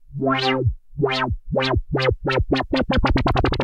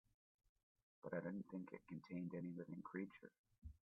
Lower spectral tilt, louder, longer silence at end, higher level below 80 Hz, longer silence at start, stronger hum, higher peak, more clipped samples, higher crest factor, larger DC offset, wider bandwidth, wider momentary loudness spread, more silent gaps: second, -7 dB/octave vs -8.5 dB/octave; first, -21 LUFS vs -52 LUFS; about the same, 0 s vs 0.1 s; first, -28 dBFS vs -74 dBFS; second, 0.1 s vs 1.05 s; neither; first, -6 dBFS vs -34 dBFS; neither; second, 14 dB vs 20 dB; neither; first, 9.4 kHz vs 4.6 kHz; second, 4 LU vs 15 LU; second, none vs 3.39-3.44 s